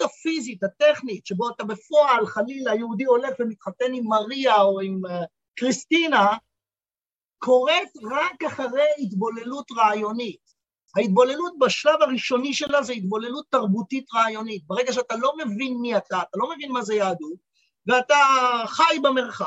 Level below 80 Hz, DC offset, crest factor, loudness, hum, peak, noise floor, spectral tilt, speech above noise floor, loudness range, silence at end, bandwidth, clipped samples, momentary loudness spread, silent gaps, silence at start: -74 dBFS; under 0.1%; 18 dB; -22 LUFS; none; -4 dBFS; under -90 dBFS; -4 dB/octave; over 68 dB; 3 LU; 0 s; 8.2 kHz; under 0.1%; 11 LU; none; 0 s